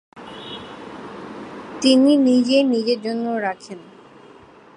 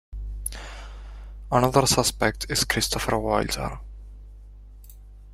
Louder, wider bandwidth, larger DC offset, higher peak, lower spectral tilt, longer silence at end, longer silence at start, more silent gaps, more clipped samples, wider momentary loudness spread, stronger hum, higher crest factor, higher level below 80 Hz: first, -18 LUFS vs -24 LUFS; second, 11 kHz vs 16 kHz; neither; about the same, -2 dBFS vs -2 dBFS; about the same, -4.5 dB/octave vs -3.5 dB/octave; first, 1 s vs 0 s; about the same, 0.15 s vs 0.1 s; neither; neither; about the same, 22 LU vs 23 LU; second, none vs 50 Hz at -40 dBFS; second, 18 dB vs 24 dB; second, -66 dBFS vs -38 dBFS